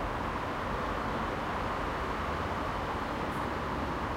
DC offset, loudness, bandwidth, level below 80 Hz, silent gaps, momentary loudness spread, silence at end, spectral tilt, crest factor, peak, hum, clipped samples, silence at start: under 0.1%; -34 LUFS; 16.5 kHz; -44 dBFS; none; 1 LU; 0 s; -6 dB/octave; 12 dB; -22 dBFS; none; under 0.1%; 0 s